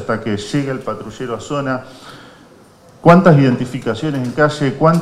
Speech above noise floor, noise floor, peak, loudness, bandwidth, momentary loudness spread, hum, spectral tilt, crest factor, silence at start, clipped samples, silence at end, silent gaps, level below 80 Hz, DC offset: 30 dB; -44 dBFS; 0 dBFS; -16 LUFS; 12 kHz; 16 LU; none; -7.5 dB/octave; 16 dB; 0 s; under 0.1%; 0 s; none; -48 dBFS; under 0.1%